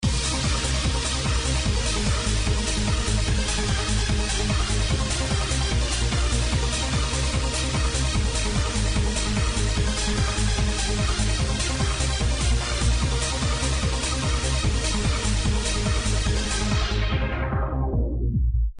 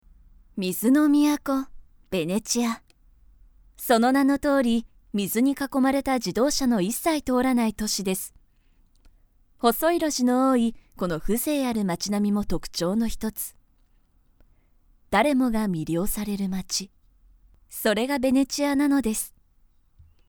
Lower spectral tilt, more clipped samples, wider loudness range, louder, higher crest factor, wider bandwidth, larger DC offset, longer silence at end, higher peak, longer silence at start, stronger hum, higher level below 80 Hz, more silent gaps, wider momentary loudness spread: about the same, -4 dB/octave vs -4.5 dB/octave; neither; second, 0 LU vs 4 LU; about the same, -24 LUFS vs -24 LUFS; second, 12 dB vs 20 dB; second, 10.5 kHz vs over 20 kHz; neither; second, 0 s vs 1 s; second, -10 dBFS vs -6 dBFS; second, 0 s vs 0.55 s; neither; first, -26 dBFS vs -46 dBFS; neither; second, 1 LU vs 10 LU